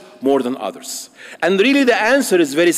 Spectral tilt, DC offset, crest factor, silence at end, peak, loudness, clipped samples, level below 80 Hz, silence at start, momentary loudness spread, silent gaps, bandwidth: -3.5 dB/octave; under 0.1%; 12 dB; 0 s; -4 dBFS; -15 LUFS; under 0.1%; -64 dBFS; 0.2 s; 15 LU; none; 16 kHz